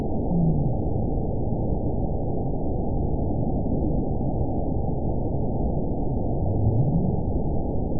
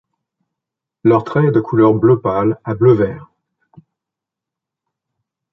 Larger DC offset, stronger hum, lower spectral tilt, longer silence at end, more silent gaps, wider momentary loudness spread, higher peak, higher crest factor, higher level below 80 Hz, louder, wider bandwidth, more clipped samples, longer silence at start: first, 3% vs under 0.1%; neither; first, -19.5 dB/octave vs -11 dB/octave; second, 0 s vs 2.3 s; neither; about the same, 5 LU vs 7 LU; second, -10 dBFS vs -2 dBFS; about the same, 14 dB vs 16 dB; first, -30 dBFS vs -50 dBFS; second, -26 LUFS vs -14 LUFS; second, 1 kHz vs 5.8 kHz; neither; second, 0 s vs 1.05 s